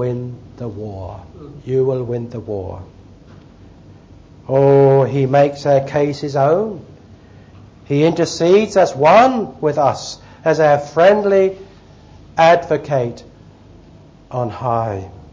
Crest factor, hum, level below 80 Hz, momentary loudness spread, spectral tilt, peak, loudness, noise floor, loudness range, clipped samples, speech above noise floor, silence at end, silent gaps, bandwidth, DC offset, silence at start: 16 dB; none; -46 dBFS; 19 LU; -6.5 dB/octave; 0 dBFS; -15 LUFS; -43 dBFS; 10 LU; under 0.1%; 28 dB; 0.1 s; none; 8 kHz; under 0.1%; 0 s